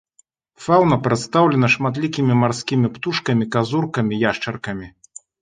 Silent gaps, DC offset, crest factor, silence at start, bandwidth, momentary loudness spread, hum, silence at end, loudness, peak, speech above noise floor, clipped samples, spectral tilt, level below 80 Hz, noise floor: none; under 0.1%; 18 dB; 0.6 s; 9.4 kHz; 12 LU; none; 0.55 s; -19 LUFS; -2 dBFS; 41 dB; under 0.1%; -6 dB/octave; -54 dBFS; -60 dBFS